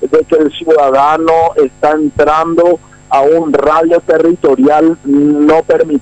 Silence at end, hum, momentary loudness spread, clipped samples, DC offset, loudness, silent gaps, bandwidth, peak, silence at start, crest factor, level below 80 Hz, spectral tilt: 0 s; none; 3 LU; under 0.1%; under 0.1%; -10 LUFS; none; 9 kHz; -2 dBFS; 0 s; 6 dB; -42 dBFS; -6.5 dB/octave